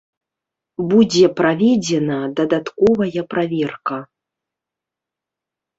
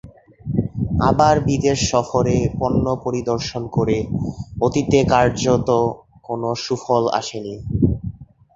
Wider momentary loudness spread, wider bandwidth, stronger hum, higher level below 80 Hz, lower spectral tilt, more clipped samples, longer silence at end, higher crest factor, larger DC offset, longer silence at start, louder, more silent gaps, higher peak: about the same, 12 LU vs 11 LU; about the same, 8 kHz vs 8 kHz; neither; second, -56 dBFS vs -36 dBFS; about the same, -5.5 dB/octave vs -6 dB/octave; neither; first, 1.75 s vs 0.3 s; about the same, 18 dB vs 18 dB; neither; first, 0.8 s vs 0.05 s; about the same, -17 LUFS vs -19 LUFS; neither; about the same, -2 dBFS vs -2 dBFS